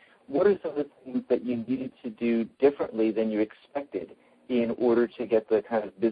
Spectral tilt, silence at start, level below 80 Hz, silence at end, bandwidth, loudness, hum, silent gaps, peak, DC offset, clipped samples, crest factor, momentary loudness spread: -9.5 dB/octave; 0.3 s; -68 dBFS; 0 s; 5 kHz; -28 LUFS; none; none; -10 dBFS; under 0.1%; under 0.1%; 18 dB; 10 LU